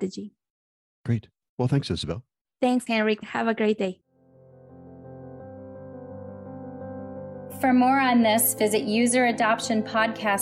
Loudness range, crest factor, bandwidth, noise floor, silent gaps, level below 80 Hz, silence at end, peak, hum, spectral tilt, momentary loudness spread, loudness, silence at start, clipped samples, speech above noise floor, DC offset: 17 LU; 14 dB; 16 kHz; -55 dBFS; 0.50-1.04 s, 1.49-1.58 s, 2.41-2.45 s; -58 dBFS; 0 s; -12 dBFS; none; -4.5 dB/octave; 22 LU; -23 LUFS; 0 s; under 0.1%; 32 dB; under 0.1%